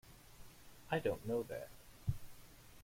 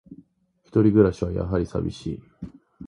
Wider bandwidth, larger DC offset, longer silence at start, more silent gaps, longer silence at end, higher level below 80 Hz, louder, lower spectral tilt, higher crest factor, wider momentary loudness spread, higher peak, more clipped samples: first, 16.5 kHz vs 10.5 kHz; neither; about the same, 0.05 s vs 0.1 s; neither; about the same, 0 s vs 0 s; second, -58 dBFS vs -42 dBFS; second, -42 LUFS vs -23 LUFS; second, -6.5 dB/octave vs -9 dB/octave; about the same, 20 dB vs 20 dB; about the same, 22 LU vs 24 LU; second, -24 dBFS vs -4 dBFS; neither